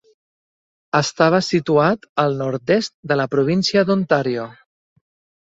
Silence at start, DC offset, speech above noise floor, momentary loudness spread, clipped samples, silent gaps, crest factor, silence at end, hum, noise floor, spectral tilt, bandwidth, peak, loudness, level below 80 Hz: 0.95 s; under 0.1%; over 72 dB; 6 LU; under 0.1%; 2.09-2.15 s, 2.94-3.03 s; 18 dB; 0.9 s; none; under -90 dBFS; -5.5 dB/octave; 8 kHz; -2 dBFS; -18 LUFS; -58 dBFS